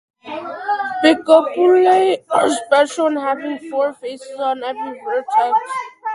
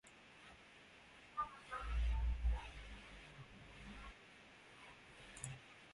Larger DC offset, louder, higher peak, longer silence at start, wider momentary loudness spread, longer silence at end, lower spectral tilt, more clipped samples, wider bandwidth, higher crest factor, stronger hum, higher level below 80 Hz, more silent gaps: neither; first, -17 LUFS vs -48 LUFS; first, 0 dBFS vs -30 dBFS; first, 0.25 s vs 0.05 s; second, 14 LU vs 19 LU; about the same, 0 s vs 0 s; second, -3 dB/octave vs -4.5 dB/octave; neither; about the same, 11.5 kHz vs 11.5 kHz; about the same, 16 dB vs 18 dB; neither; second, -66 dBFS vs -48 dBFS; neither